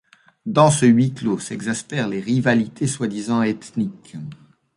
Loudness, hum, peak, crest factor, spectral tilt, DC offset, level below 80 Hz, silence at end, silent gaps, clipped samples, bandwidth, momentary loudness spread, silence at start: -20 LUFS; none; -2 dBFS; 18 dB; -5.5 dB/octave; under 0.1%; -58 dBFS; 0.4 s; none; under 0.1%; 11.5 kHz; 18 LU; 0.45 s